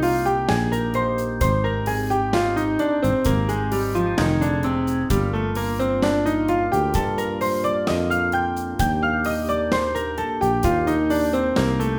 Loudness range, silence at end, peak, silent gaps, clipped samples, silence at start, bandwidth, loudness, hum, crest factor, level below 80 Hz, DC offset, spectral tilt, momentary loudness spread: 1 LU; 0 s; -6 dBFS; none; under 0.1%; 0 s; over 20 kHz; -22 LUFS; none; 16 dB; -34 dBFS; under 0.1%; -6.5 dB/octave; 3 LU